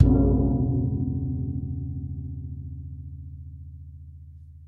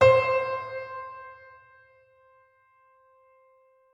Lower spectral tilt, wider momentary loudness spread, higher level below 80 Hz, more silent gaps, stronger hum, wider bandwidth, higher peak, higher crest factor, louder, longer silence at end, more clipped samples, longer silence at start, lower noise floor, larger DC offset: first, -13.5 dB/octave vs -5.5 dB/octave; second, 22 LU vs 27 LU; first, -34 dBFS vs -64 dBFS; neither; neither; second, 1.5 kHz vs 8.6 kHz; about the same, -4 dBFS vs -6 dBFS; about the same, 22 dB vs 22 dB; about the same, -27 LUFS vs -26 LUFS; second, 0 s vs 2.6 s; neither; about the same, 0 s vs 0 s; second, -45 dBFS vs -62 dBFS; neither